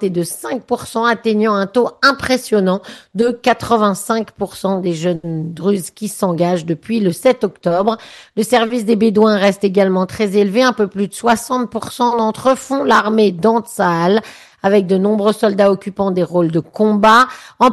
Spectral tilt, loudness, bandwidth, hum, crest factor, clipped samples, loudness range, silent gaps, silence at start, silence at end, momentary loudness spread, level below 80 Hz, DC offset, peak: -5.5 dB/octave; -15 LUFS; 12.5 kHz; none; 14 dB; under 0.1%; 4 LU; none; 0 s; 0 s; 8 LU; -52 dBFS; under 0.1%; 0 dBFS